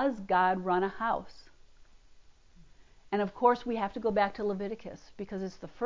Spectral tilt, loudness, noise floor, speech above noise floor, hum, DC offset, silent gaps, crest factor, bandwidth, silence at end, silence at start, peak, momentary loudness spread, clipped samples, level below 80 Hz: -7 dB/octave; -31 LUFS; -56 dBFS; 25 dB; none; under 0.1%; none; 22 dB; 7.6 kHz; 0 s; 0 s; -12 dBFS; 14 LU; under 0.1%; -60 dBFS